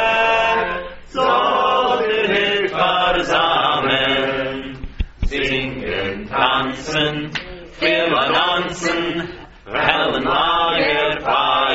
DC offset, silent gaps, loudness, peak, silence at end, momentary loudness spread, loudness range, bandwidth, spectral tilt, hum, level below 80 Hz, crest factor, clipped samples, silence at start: under 0.1%; none; -17 LUFS; 0 dBFS; 0 s; 11 LU; 4 LU; 8 kHz; -1 dB/octave; none; -36 dBFS; 18 dB; under 0.1%; 0 s